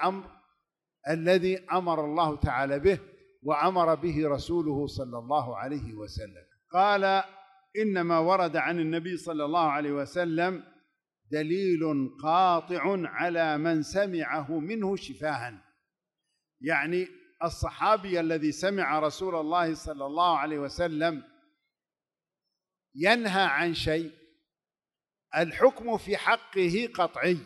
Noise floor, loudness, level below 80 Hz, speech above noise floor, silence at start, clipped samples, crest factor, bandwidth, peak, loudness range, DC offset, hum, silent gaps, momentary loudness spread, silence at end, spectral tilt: under -90 dBFS; -28 LUFS; -54 dBFS; over 63 dB; 0 s; under 0.1%; 20 dB; 12 kHz; -8 dBFS; 3 LU; under 0.1%; none; none; 10 LU; 0 s; -5.5 dB/octave